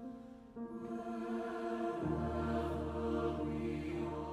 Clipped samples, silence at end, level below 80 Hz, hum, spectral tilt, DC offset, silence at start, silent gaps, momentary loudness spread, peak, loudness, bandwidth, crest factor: under 0.1%; 0 s; -54 dBFS; none; -8 dB/octave; under 0.1%; 0 s; none; 10 LU; -26 dBFS; -40 LUFS; 12 kHz; 14 dB